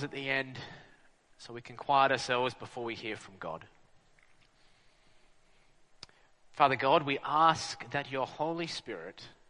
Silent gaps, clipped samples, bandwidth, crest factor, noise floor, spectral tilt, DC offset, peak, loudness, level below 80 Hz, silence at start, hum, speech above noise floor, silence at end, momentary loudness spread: none; under 0.1%; 10 kHz; 24 dB; -63 dBFS; -4 dB/octave; under 0.1%; -10 dBFS; -31 LUFS; -70 dBFS; 0 s; none; 31 dB; 0.2 s; 20 LU